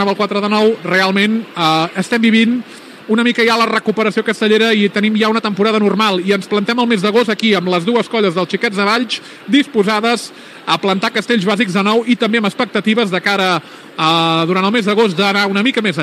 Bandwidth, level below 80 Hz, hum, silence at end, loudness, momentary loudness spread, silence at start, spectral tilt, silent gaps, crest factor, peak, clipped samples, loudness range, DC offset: 14.5 kHz; -74 dBFS; none; 0 s; -14 LUFS; 5 LU; 0 s; -5 dB/octave; none; 14 dB; 0 dBFS; under 0.1%; 2 LU; under 0.1%